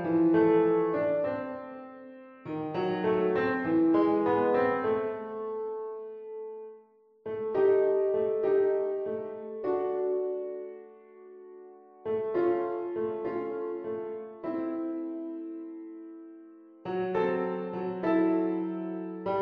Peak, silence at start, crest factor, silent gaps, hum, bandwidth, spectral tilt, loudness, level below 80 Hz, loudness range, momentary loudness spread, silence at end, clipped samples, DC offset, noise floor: -14 dBFS; 0 s; 16 dB; none; none; 5 kHz; -9.5 dB/octave; -29 LUFS; -70 dBFS; 7 LU; 20 LU; 0 s; under 0.1%; under 0.1%; -58 dBFS